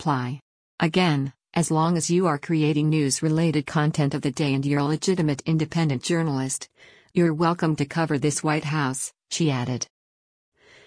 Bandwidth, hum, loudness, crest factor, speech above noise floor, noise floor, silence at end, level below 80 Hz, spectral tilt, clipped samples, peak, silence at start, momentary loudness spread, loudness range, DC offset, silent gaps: 10.5 kHz; none; -24 LUFS; 16 dB; over 67 dB; under -90 dBFS; 1 s; -60 dBFS; -5.5 dB/octave; under 0.1%; -8 dBFS; 0 s; 7 LU; 2 LU; under 0.1%; 0.42-0.78 s